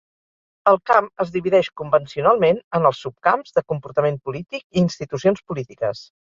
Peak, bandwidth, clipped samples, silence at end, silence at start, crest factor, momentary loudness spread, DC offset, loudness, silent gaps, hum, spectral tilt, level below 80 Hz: -2 dBFS; 7.4 kHz; under 0.1%; 0.25 s; 0.65 s; 18 dB; 10 LU; under 0.1%; -20 LUFS; 2.64-2.71 s, 4.64-4.70 s; none; -6.5 dB/octave; -58 dBFS